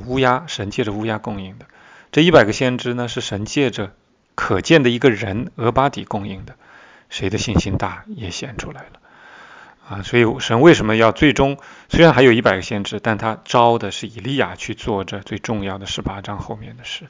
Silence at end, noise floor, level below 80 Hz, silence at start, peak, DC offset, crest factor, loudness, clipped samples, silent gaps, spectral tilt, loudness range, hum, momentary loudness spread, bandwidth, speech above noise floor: 0.05 s; -46 dBFS; -40 dBFS; 0 s; 0 dBFS; under 0.1%; 18 dB; -17 LUFS; under 0.1%; none; -5.5 dB/octave; 10 LU; none; 18 LU; 7.6 kHz; 29 dB